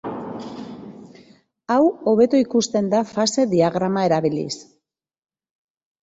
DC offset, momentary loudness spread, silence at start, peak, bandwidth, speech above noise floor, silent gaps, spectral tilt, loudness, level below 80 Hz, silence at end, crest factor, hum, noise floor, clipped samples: under 0.1%; 18 LU; 0.05 s; -4 dBFS; 8.2 kHz; 60 dB; none; -5.5 dB/octave; -19 LUFS; -62 dBFS; 1.4 s; 16 dB; none; -79 dBFS; under 0.1%